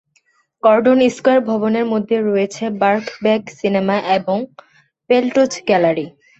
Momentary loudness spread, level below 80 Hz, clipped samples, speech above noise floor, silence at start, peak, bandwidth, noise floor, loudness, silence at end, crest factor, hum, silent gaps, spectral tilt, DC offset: 6 LU; -62 dBFS; under 0.1%; 45 dB; 0.65 s; -2 dBFS; 8.2 kHz; -60 dBFS; -16 LUFS; 0.3 s; 16 dB; none; none; -5.5 dB/octave; under 0.1%